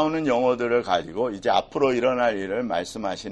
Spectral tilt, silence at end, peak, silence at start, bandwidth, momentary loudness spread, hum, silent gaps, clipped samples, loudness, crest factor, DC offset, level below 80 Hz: -5 dB/octave; 0 s; -6 dBFS; 0 s; 11.5 kHz; 6 LU; none; none; under 0.1%; -24 LUFS; 18 dB; under 0.1%; -54 dBFS